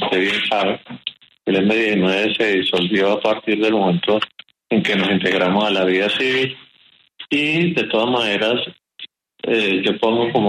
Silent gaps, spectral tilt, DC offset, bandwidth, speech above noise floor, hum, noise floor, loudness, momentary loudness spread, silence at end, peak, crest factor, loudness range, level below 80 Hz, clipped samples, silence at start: none; -5.5 dB/octave; under 0.1%; 12.5 kHz; 37 dB; none; -54 dBFS; -18 LUFS; 12 LU; 0 s; -6 dBFS; 14 dB; 2 LU; -60 dBFS; under 0.1%; 0 s